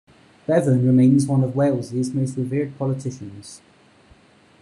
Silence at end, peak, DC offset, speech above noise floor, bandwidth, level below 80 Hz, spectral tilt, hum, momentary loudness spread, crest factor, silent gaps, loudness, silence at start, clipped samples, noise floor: 1.05 s; -6 dBFS; under 0.1%; 33 dB; 11 kHz; -56 dBFS; -8 dB/octave; none; 20 LU; 16 dB; none; -20 LUFS; 0.5 s; under 0.1%; -53 dBFS